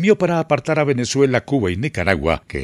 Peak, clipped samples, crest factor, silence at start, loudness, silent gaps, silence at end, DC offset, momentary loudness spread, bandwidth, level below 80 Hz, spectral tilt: 0 dBFS; under 0.1%; 18 dB; 0 s; -18 LUFS; none; 0 s; under 0.1%; 4 LU; 12 kHz; -42 dBFS; -6 dB/octave